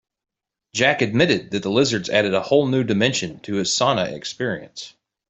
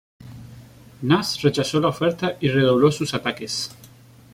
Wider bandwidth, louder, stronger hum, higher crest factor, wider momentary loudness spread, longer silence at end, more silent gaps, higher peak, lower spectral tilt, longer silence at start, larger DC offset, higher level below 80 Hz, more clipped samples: second, 8.2 kHz vs 16 kHz; about the same, -20 LUFS vs -21 LUFS; neither; about the same, 20 dB vs 18 dB; second, 10 LU vs 14 LU; about the same, 0.4 s vs 0.5 s; neither; about the same, -2 dBFS vs -4 dBFS; second, -4 dB/octave vs -5.5 dB/octave; first, 0.75 s vs 0.2 s; neither; about the same, -58 dBFS vs -54 dBFS; neither